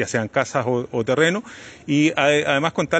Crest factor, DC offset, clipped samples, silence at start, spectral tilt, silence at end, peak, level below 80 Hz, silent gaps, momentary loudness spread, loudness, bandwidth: 18 dB; under 0.1%; under 0.1%; 0 s; -5 dB/octave; 0 s; -4 dBFS; -58 dBFS; none; 9 LU; -20 LUFS; 9.2 kHz